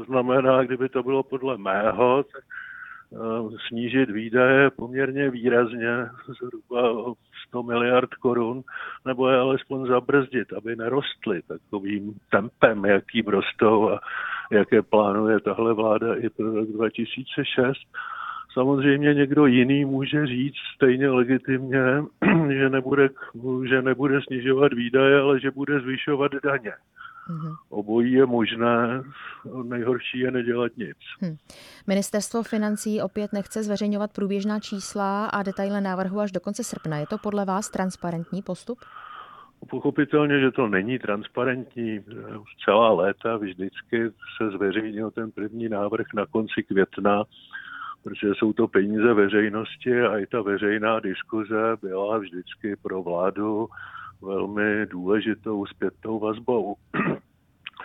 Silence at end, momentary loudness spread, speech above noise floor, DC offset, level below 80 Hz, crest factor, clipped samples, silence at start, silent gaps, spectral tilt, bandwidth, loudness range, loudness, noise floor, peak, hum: 0 s; 15 LU; 23 dB; under 0.1%; -62 dBFS; 22 dB; under 0.1%; 0 s; none; -6 dB/octave; 13 kHz; 6 LU; -24 LUFS; -46 dBFS; -2 dBFS; none